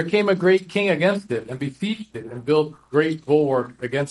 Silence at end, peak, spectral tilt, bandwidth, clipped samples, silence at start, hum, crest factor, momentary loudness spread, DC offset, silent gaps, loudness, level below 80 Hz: 0 s; -4 dBFS; -6.5 dB/octave; 11.5 kHz; under 0.1%; 0 s; none; 16 dB; 11 LU; under 0.1%; none; -22 LUFS; -62 dBFS